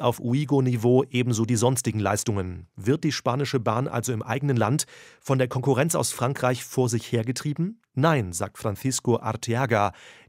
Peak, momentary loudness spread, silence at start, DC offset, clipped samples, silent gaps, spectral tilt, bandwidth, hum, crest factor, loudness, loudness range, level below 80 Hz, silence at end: -6 dBFS; 7 LU; 0 s; under 0.1%; under 0.1%; none; -5.5 dB/octave; 16 kHz; none; 18 dB; -25 LUFS; 2 LU; -60 dBFS; 0.15 s